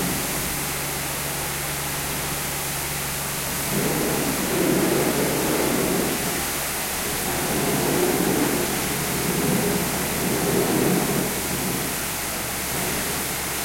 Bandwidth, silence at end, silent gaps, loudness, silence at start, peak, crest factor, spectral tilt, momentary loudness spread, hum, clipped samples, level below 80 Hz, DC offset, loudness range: 16.5 kHz; 0 s; none; -23 LUFS; 0 s; -8 dBFS; 16 dB; -3.5 dB/octave; 4 LU; none; under 0.1%; -42 dBFS; under 0.1%; 3 LU